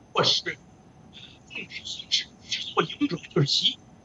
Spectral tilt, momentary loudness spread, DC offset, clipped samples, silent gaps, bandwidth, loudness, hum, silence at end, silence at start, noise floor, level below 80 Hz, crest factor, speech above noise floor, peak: -3.5 dB/octave; 19 LU; under 0.1%; under 0.1%; none; 8.2 kHz; -26 LUFS; none; 0.3 s; 0.15 s; -52 dBFS; -64 dBFS; 20 dB; 26 dB; -8 dBFS